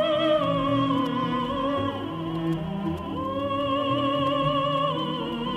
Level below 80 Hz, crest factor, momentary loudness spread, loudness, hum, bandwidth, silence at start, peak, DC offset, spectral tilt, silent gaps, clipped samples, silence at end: -50 dBFS; 14 dB; 7 LU; -26 LUFS; none; 11.5 kHz; 0 s; -12 dBFS; under 0.1%; -7.5 dB/octave; none; under 0.1%; 0 s